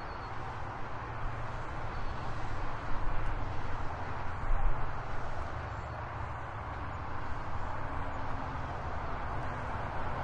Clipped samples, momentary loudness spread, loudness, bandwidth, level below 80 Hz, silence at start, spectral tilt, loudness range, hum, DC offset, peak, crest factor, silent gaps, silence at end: under 0.1%; 3 LU; -39 LUFS; 7.2 kHz; -38 dBFS; 0 s; -7 dB/octave; 1 LU; none; under 0.1%; -16 dBFS; 18 dB; none; 0 s